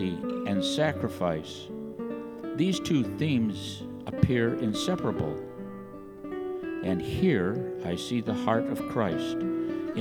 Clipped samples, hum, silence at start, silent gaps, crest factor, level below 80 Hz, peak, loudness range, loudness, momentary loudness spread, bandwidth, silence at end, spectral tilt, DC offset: under 0.1%; none; 0 s; none; 22 dB; -54 dBFS; -6 dBFS; 2 LU; -29 LUFS; 12 LU; 18.5 kHz; 0 s; -6 dB/octave; under 0.1%